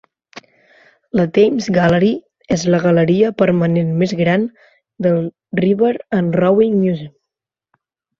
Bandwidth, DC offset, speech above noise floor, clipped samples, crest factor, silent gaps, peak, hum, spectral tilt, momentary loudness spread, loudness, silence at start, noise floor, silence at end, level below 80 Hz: 7.4 kHz; under 0.1%; 68 dB; under 0.1%; 14 dB; none; -2 dBFS; none; -7 dB/octave; 8 LU; -16 LUFS; 0.35 s; -82 dBFS; 1.1 s; -52 dBFS